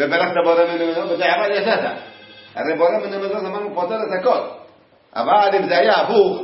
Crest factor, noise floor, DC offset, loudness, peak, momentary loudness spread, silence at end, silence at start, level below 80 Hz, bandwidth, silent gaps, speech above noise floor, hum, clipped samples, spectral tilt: 16 dB; -50 dBFS; under 0.1%; -18 LUFS; -2 dBFS; 11 LU; 0 s; 0 s; -70 dBFS; 5.8 kHz; none; 32 dB; none; under 0.1%; -8 dB/octave